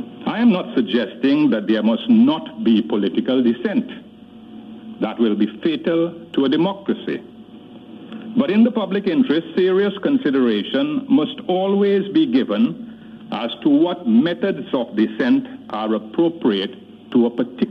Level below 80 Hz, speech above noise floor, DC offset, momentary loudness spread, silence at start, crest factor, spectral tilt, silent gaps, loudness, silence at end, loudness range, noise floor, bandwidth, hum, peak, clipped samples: -64 dBFS; 23 dB; under 0.1%; 11 LU; 0 s; 14 dB; -8.5 dB/octave; none; -19 LUFS; 0 s; 4 LU; -41 dBFS; 5.4 kHz; none; -6 dBFS; under 0.1%